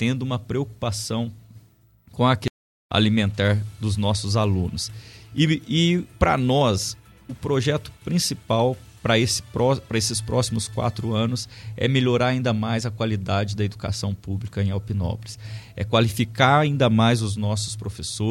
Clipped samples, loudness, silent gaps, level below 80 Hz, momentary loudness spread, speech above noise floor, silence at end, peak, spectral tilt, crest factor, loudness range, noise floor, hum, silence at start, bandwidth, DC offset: under 0.1%; -23 LUFS; 2.50-2.89 s; -44 dBFS; 11 LU; 33 dB; 0 s; -2 dBFS; -5 dB/octave; 20 dB; 3 LU; -55 dBFS; none; 0 s; 15.5 kHz; under 0.1%